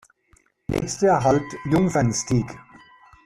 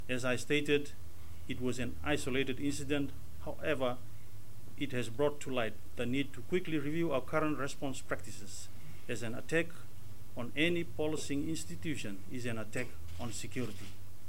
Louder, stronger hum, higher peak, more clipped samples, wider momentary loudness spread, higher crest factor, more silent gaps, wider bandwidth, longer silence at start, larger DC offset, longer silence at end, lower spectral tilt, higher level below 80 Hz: first, -22 LUFS vs -37 LUFS; neither; first, -6 dBFS vs -16 dBFS; neither; second, 14 LU vs 17 LU; second, 16 dB vs 22 dB; neither; second, 13.5 kHz vs 16 kHz; first, 0.7 s vs 0 s; second, under 0.1% vs 2%; first, 0.65 s vs 0 s; about the same, -6 dB/octave vs -5 dB/octave; first, -46 dBFS vs -56 dBFS